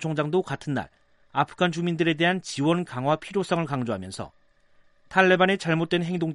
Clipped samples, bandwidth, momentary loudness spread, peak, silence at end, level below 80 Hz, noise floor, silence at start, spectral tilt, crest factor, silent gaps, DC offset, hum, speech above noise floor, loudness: under 0.1%; 11.5 kHz; 11 LU; -2 dBFS; 0 s; -62 dBFS; -59 dBFS; 0 s; -5.5 dB/octave; 22 dB; none; under 0.1%; none; 34 dB; -25 LUFS